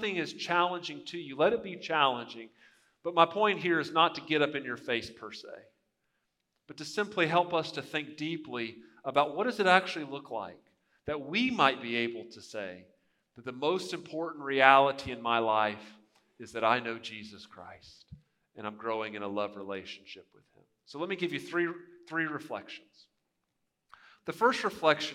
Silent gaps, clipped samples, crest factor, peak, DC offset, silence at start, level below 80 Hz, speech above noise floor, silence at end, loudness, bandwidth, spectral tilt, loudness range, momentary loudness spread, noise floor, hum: none; under 0.1%; 28 dB; -4 dBFS; under 0.1%; 0 s; -72 dBFS; 50 dB; 0 s; -30 LUFS; 15 kHz; -4.5 dB/octave; 9 LU; 19 LU; -82 dBFS; none